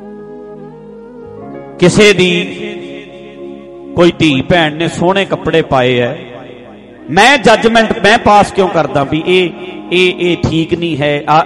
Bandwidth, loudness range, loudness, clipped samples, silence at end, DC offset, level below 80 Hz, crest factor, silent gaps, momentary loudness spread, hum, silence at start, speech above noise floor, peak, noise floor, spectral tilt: 11.5 kHz; 4 LU; -10 LUFS; 0.2%; 0 s; under 0.1%; -38 dBFS; 12 dB; none; 23 LU; none; 0 s; 24 dB; 0 dBFS; -33 dBFS; -5 dB/octave